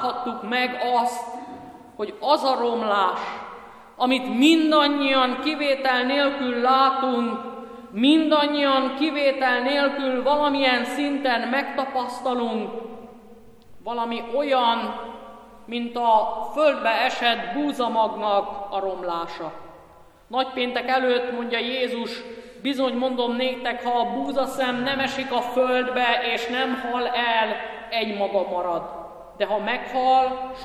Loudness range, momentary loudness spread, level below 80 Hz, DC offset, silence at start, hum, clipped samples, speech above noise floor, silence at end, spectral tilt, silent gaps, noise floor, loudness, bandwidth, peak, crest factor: 6 LU; 13 LU; -60 dBFS; under 0.1%; 0 s; none; under 0.1%; 27 dB; 0 s; -4 dB/octave; none; -50 dBFS; -23 LUFS; 14 kHz; -6 dBFS; 18 dB